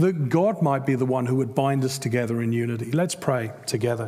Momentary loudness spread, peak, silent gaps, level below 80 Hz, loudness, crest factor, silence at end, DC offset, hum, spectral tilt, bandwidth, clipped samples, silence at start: 4 LU; -8 dBFS; none; -68 dBFS; -24 LUFS; 16 dB; 0 s; under 0.1%; none; -6.5 dB/octave; 16 kHz; under 0.1%; 0 s